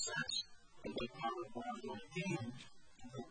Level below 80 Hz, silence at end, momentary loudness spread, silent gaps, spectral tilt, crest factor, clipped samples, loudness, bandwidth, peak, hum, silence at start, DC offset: -70 dBFS; 0 s; 13 LU; none; -3.5 dB/octave; 18 dB; under 0.1%; -44 LUFS; 9.4 kHz; -28 dBFS; none; 0 s; under 0.1%